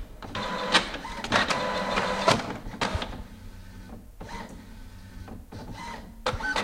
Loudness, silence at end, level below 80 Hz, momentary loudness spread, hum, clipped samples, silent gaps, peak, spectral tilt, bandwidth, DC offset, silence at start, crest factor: -28 LUFS; 0 s; -44 dBFS; 22 LU; none; under 0.1%; none; -4 dBFS; -3.5 dB/octave; 16 kHz; under 0.1%; 0 s; 26 dB